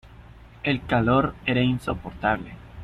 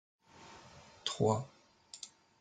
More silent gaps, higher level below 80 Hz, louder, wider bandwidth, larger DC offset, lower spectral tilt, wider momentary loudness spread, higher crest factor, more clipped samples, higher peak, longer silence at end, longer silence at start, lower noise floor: neither; first, -44 dBFS vs -72 dBFS; first, -24 LUFS vs -35 LUFS; first, 12.5 kHz vs 9.6 kHz; neither; first, -7.5 dB/octave vs -5 dB/octave; second, 10 LU vs 23 LU; second, 18 dB vs 24 dB; neither; first, -6 dBFS vs -16 dBFS; second, 0 s vs 0.35 s; second, 0.05 s vs 0.4 s; second, -46 dBFS vs -58 dBFS